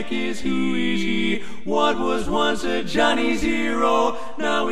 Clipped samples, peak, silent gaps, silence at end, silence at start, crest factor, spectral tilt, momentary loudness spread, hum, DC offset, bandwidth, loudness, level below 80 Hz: under 0.1%; -4 dBFS; none; 0 s; 0 s; 18 dB; -4.5 dB/octave; 6 LU; none; 5%; 13.5 kHz; -22 LUFS; -42 dBFS